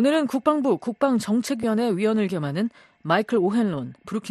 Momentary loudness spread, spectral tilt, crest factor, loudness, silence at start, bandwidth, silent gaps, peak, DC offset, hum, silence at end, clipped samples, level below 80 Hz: 9 LU; -6 dB/octave; 16 dB; -23 LUFS; 0 s; 13 kHz; none; -6 dBFS; under 0.1%; none; 0 s; under 0.1%; -64 dBFS